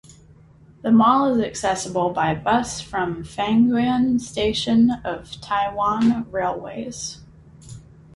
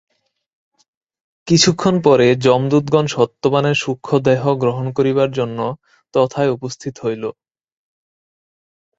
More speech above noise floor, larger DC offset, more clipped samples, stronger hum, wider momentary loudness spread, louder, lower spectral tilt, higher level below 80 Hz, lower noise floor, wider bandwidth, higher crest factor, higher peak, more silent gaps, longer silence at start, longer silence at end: second, 29 dB vs over 74 dB; neither; neither; neither; about the same, 13 LU vs 12 LU; second, -21 LUFS vs -16 LUFS; about the same, -5 dB/octave vs -5.5 dB/octave; first, -48 dBFS vs -54 dBFS; second, -49 dBFS vs under -90 dBFS; first, 11.5 kHz vs 8 kHz; about the same, 16 dB vs 18 dB; second, -4 dBFS vs 0 dBFS; neither; second, 0.1 s vs 1.45 s; second, 0.35 s vs 1.65 s